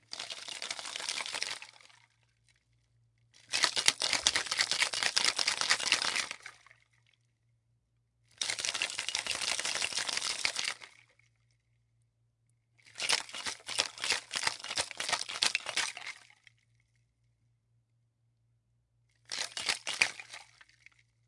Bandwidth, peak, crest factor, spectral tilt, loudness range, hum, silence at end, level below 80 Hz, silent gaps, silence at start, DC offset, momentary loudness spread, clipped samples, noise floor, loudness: 11.5 kHz; -2 dBFS; 34 dB; 1.5 dB/octave; 10 LU; none; 0.85 s; -74 dBFS; none; 0.1 s; under 0.1%; 13 LU; under 0.1%; -75 dBFS; -31 LUFS